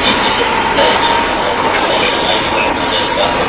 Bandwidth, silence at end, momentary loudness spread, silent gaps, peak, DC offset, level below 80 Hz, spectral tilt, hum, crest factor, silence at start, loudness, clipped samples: 4 kHz; 0 s; 3 LU; none; 0 dBFS; under 0.1%; -34 dBFS; -7.5 dB/octave; none; 12 dB; 0 s; -12 LUFS; under 0.1%